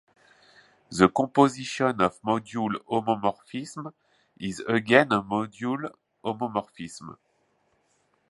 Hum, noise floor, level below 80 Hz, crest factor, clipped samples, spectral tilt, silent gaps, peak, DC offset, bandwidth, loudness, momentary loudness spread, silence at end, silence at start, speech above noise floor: none; -69 dBFS; -62 dBFS; 26 dB; under 0.1%; -5.5 dB/octave; none; -2 dBFS; under 0.1%; 11.5 kHz; -26 LUFS; 19 LU; 1.15 s; 0.9 s; 44 dB